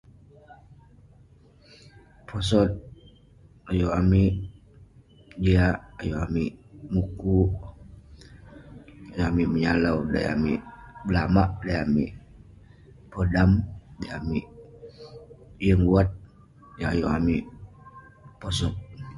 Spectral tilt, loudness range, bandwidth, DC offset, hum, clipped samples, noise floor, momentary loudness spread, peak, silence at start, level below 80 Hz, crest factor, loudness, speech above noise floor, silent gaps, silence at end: -7.5 dB/octave; 4 LU; 11.5 kHz; under 0.1%; none; under 0.1%; -54 dBFS; 24 LU; -6 dBFS; 0.5 s; -38 dBFS; 20 dB; -25 LUFS; 31 dB; none; 0 s